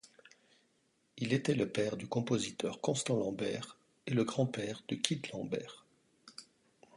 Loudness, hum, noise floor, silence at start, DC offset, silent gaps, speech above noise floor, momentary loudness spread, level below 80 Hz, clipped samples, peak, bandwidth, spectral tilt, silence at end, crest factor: -36 LUFS; none; -75 dBFS; 0.05 s; under 0.1%; none; 40 dB; 17 LU; -72 dBFS; under 0.1%; -10 dBFS; 11.5 kHz; -5 dB/octave; 0.55 s; 28 dB